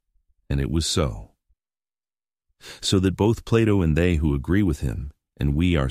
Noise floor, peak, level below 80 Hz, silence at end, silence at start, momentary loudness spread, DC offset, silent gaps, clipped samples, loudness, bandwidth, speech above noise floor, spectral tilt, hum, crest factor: under -90 dBFS; -6 dBFS; -34 dBFS; 0 s; 0.5 s; 10 LU; under 0.1%; none; under 0.1%; -23 LUFS; 15 kHz; over 69 dB; -6 dB/octave; none; 18 dB